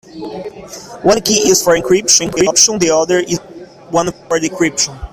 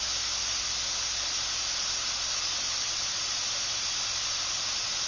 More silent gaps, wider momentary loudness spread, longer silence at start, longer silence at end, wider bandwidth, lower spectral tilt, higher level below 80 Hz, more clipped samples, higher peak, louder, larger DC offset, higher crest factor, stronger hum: neither; first, 18 LU vs 0 LU; first, 0.15 s vs 0 s; about the same, 0.05 s vs 0 s; first, over 20 kHz vs 7.6 kHz; first, -2.5 dB/octave vs 1.5 dB/octave; first, -42 dBFS vs -54 dBFS; neither; first, 0 dBFS vs -18 dBFS; first, -12 LUFS vs -28 LUFS; neither; about the same, 14 dB vs 12 dB; neither